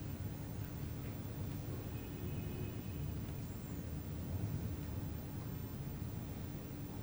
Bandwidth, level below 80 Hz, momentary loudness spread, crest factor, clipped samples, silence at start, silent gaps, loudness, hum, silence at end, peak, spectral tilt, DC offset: over 20 kHz; -52 dBFS; 3 LU; 14 dB; under 0.1%; 0 s; none; -44 LUFS; none; 0 s; -28 dBFS; -7 dB/octave; under 0.1%